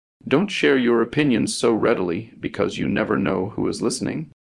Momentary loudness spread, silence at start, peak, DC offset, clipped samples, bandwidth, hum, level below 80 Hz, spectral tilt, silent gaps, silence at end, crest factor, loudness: 8 LU; 0.25 s; -4 dBFS; under 0.1%; under 0.1%; 12 kHz; none; -54 dBFS; -5 dB/octave; none; 0.2 s; 18 dB; -21 LUFS